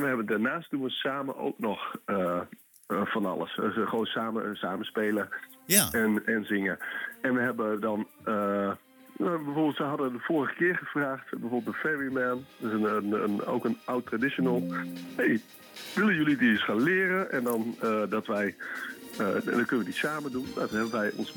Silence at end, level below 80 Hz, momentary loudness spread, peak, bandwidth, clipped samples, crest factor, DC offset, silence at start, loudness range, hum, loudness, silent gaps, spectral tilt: 0 s; -70 dBFS; 9 LU; -4 dBFS; 19 kHz; under 0.1%; 26 dB; under 0.1%; 0 s; 4 LU; none; -29 LUFS; none; -4.5 dB/octave